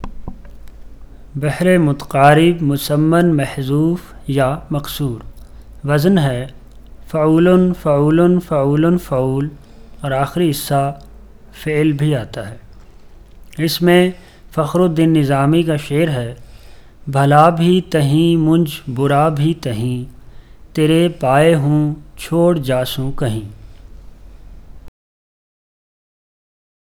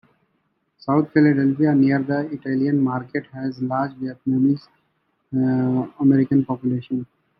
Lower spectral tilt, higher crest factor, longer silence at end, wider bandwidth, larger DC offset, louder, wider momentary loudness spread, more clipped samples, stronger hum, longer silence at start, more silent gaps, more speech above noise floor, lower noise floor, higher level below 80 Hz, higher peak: second, -7 dB/octave vs -11 dB/octave; about the same, 16 dB vs 16 dB; first, 2 s vs 0.35 s; first, 17.5 kHz vs 5.8 kHz; neither; first, -15 LUFS vs -21 LUFS; first, 14 LU vs 11 LU; neither; neither; second, 0 s vs 0.85 s; neither; second, 25 dB vs 50 dB; second, -39 dBFS vs -69 dBFS; first, -38 dBFS vs -64 dBFS; first, 0 dBFS vs -4 dBFS